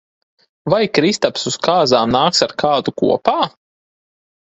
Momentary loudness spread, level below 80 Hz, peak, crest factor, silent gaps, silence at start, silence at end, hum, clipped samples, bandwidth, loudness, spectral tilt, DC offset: 5 LU; -52 dBFS; 0 dBFS; 18 dB; none; 0.65 s; 1 s; none; under 0.1%; 8.4 kHz; -16 LUFS; -4 dB/octave; under 0.1%